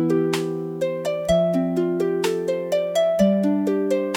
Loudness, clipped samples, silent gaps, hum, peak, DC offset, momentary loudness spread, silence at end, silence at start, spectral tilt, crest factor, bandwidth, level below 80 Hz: -22 LUFS; under 0.1%; none; none; -6 dBFS; under 0.1%; 6 LU; 0 s; 0 s; -6.5 dB/octave; 14 dB; 18 kHz; -52 dBFS